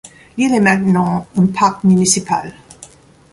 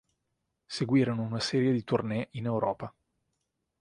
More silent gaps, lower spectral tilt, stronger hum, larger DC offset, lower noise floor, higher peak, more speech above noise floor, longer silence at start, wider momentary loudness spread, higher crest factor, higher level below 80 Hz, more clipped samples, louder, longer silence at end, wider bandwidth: neither; second, -5 dB/octave vs -6.5 dB/octave; neither; neither; second, -42 dBFS vs -82 dBFS; first, 0 dBFS vs -12 dBFS; second, 28 dB vs 53 dB; second, 0.05 s vs 0.7 s; about the same, 9 LU vs 11 LU; about the same, 16 dB vs 18 dB; first, -50 dBFS vs -64 dBFS; neither; first, -14 LUFS vs -30 LUFS; second, 0.5 s vs 0.9 s; about the same, 11.5 kHz vs 11 kHz